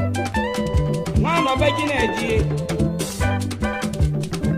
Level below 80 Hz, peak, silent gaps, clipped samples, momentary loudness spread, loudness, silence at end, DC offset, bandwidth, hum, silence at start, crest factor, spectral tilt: -30 dBFS; -4 dBFS; none; under 0.1%; 5 LU; -21 LUFS; 0 s; under 0.1%; 15.5 kHz; none; 0 s; 16 dB; -6 dB/octave